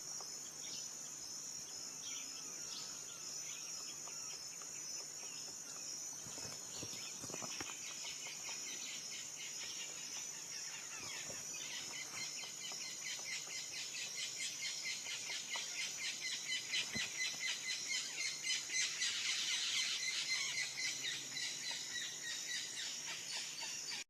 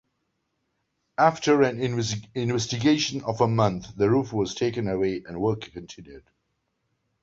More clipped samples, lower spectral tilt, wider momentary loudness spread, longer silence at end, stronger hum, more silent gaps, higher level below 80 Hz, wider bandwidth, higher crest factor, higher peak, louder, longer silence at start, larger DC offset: neither; second, 1 dB/octave vs -5.5 dB/octave; second, 8 LU vs 12 LU; second, 0.05 s vs 1.05 s; neither; neither; second, -82 dBFS vs -56 dBFS; first, 14 kHz vs 7.8 kHz; about the same, 20 dB vs 22 dB; second, -26 dBFS vs -4 dBFS; second, -41 LUFS vs -24 LUFS; second, 0 s vs 1.2 s; neither